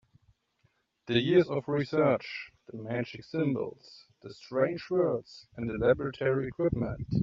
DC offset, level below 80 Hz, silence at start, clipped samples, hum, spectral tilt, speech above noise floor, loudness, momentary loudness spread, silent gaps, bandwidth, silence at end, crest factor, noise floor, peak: under 0.1%; -56 dBFS; 1.05 s; under 0.1%; none; -5.5 dB/octave; 43 dB; -30 LUFS; 16 LU; none; 7.4 kHz; 0 s; 20 dB; -72 dBFS; -12 dBFS